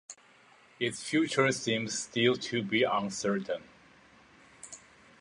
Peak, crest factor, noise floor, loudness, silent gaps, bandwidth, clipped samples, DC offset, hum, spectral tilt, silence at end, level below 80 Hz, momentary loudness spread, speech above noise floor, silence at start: -10 dBFS; 22 dB; -60 dBFS; -30 LUFS; none; 11.5 kHz; under 0.1%; under 0.1%; none; -4 dB/octave; 0.45 s; -72 dBFS; 20 LU; 30 dB; 0.1 s